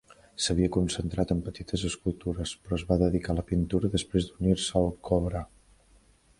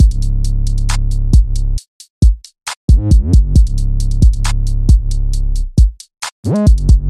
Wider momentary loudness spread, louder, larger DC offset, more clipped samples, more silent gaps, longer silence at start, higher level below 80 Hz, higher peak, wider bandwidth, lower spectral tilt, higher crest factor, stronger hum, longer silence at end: second, 8 LU vs 11 LU; second, -29 LUFS vs -15 LUFS; neither; neither; second, none vs 1.88-2.00 s, 2.10-2.21 s, 2.76-2.88 s, 6.32-6.43 s; first, 0.4 s vs 0 s; second, -40 dBFS vs -12 dBFS; second, -10 dBFS vs 0 dBFS; about the same, 11.5 kHz vs 12 kHz; about the same, -5.5 dB/octave vs -6.5 dB/octave; first, 20 dB vs 12 dB; neither; first, 0.95 s vs 0 s